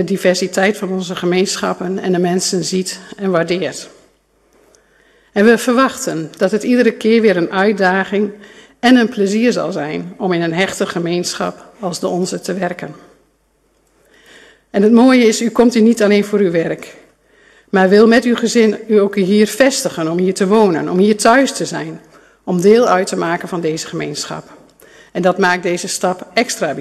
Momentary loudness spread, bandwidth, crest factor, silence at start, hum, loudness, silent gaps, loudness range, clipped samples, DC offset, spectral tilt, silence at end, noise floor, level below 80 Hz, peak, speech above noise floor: 11 LU; 13.5 kHz; 14 dB; 0 s; none; -14 LUFS; none; 6 LU; under 0.1%; under 0.1%; -4.5 dB/octave; 0 s; -58 dBFS; -56 dBFS; 0 dBFS; 45 dB